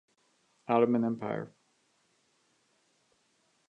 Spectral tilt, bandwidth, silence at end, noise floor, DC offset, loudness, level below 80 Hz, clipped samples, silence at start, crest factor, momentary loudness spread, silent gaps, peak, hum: -8.5 dB/octave; 7 kHz; 2.2 s; -72 dBFS; under 0.1%; -30 LUFS; -80 dBFS; under 0.1%; 0.7 s; 22 dB; 20 LU; none; -12 dBFS; none